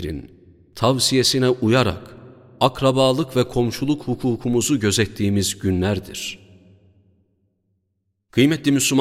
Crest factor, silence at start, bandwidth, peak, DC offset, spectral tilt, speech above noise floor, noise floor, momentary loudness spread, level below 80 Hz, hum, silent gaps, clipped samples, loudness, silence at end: 20 dB; 0 s; 16.5 kHz; 0 dBFS; under 0.1%; -4.5 dB/octave; 53 dB; -72 dBFS; 11 LU; -46 dBFS; none; none; under 0.1%; -19 LUFS; 0 s